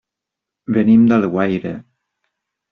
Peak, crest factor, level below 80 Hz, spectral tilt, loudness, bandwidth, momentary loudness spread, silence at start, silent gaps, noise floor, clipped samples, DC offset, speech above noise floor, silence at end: -4 dBFS; 14 dB; -56 dBFS; -7.5 dB/octave; -15 LUFS; 4.1 kHz; 20 LU; 0.7 s; none; -83 dBFS; under 0.1%; under 0.1%; 69 dB; 0.9 s